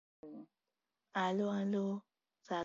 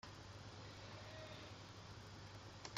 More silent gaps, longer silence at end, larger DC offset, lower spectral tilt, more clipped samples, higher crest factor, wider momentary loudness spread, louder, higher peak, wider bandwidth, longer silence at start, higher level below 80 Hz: neither; about the same, 0 s vs 0 s; neither; about the same, -5 dB/octave vs -4 dB/octave; neither; second, 16 dB vs 26 dB; first, 19 LU vs 2 LU; first, -38 LUFS vs -55 LUFS; first, -24 dBFS vs -30 dBFS; second, 7.4 kHz vs 15.5 kHz; first, 0.25 s vs 0.05 s; second, -88 dBFS vs -70 dBFS